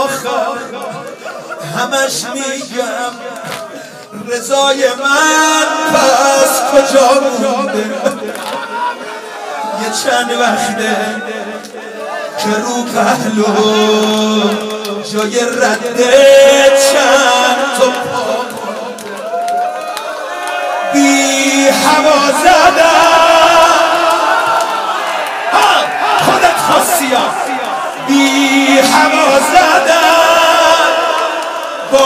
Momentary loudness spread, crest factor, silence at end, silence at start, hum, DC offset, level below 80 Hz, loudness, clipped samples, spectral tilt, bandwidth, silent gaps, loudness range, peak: 15 LU; 12 dB; 0 s; 0 s; none; under 0.1%; -50 dBFS; -10 LUFS; 0.4%; -2 dB/octave; 16.5 kHz; none; 8 LU; 0 dBFS